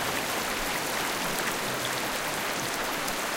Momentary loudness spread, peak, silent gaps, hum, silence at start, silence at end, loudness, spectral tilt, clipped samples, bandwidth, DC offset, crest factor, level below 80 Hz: 1 LU; -12 dBFS; none; none; 0 s; 0 s; -29 LUFS; -2 dB/octave; under 0.1%; 17 kHz; under 0.1%; 18 dB; -50 dBFS